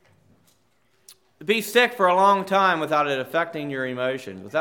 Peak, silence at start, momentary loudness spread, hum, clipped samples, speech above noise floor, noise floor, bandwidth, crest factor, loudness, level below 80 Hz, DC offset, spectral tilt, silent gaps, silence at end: -6 dBFS; 1.1 s; 10 LU; none; under 0.1%; 44 dB; -66 dBFS; 19 kHz; 18 dB; -22 LUFS; -80 dBFS; under 0.1%; -4 dB/octave; none; 0 s